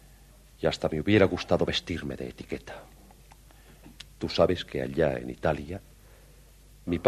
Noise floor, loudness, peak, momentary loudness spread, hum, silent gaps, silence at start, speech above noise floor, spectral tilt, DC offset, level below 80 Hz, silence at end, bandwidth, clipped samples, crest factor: -54 dBFS; -28 LUFS; -6 dBFS; 19 LU; none; none; 0.6 s; 26 dB; -6 dB/octave; under 0.1%; -48 dBFS; 0 s; 13.5 kHz; under 0.1%; 24 dB